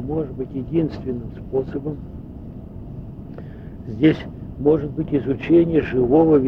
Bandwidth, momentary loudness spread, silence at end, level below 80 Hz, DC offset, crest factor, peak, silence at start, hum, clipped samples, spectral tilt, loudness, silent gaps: 5.4 kHz; 20 LU; 0 s; -40 dBFS; under 0.1%; 18 dB; -2 dBFS; 0 s; none; under 0.1%; -10 dB/octave; -21 LUFS; none